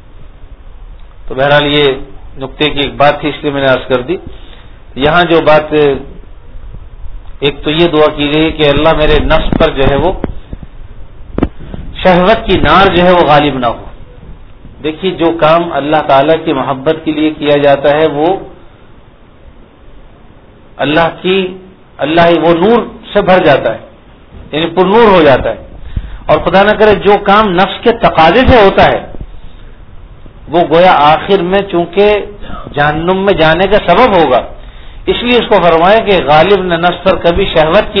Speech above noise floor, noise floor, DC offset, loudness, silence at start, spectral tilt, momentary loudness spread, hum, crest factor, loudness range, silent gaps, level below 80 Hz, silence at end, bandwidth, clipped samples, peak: 29 dB; -37 dBFS; under 0.1%; -9 LUFS; 0.15 s; -7.5 dB/octave; 13 LU; none; 10 dB; 4 LU; none; -26 dBFS; 0 s; 5.4 kHz; 1%; 0 dBFS